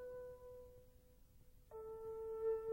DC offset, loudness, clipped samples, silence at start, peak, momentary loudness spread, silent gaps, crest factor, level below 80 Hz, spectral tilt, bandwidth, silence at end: under 0.1%; -49 LUFS; under 0.1%; 0 s; -32 dBFS; 21 LU; none; 16 dB; -68 dBFS; -6.5 dB/octave; 16 kHz; 0 s